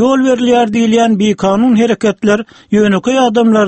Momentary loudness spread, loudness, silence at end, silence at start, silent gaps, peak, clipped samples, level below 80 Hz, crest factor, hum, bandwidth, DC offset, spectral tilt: 3 LU; -11 LUFS; 0 s; 0 s; none; 0 dBFS; under 0.1%; -48 dBFS; 10 dB; none; 8.6 kHz; under 0.1%; -5.5 dB/octave